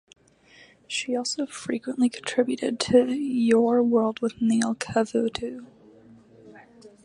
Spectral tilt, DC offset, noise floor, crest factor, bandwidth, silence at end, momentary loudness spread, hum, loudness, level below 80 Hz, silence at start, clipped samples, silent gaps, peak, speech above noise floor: -4.5 dB/octave; under 0.1%; -55 dBFS; 20 dB; 11 kHz; 0.15 s; 10 LU; none; -24 LUFS; -62 dBFS; 0.9 s; under 0.1%; none; -6 dBFS; 31 dB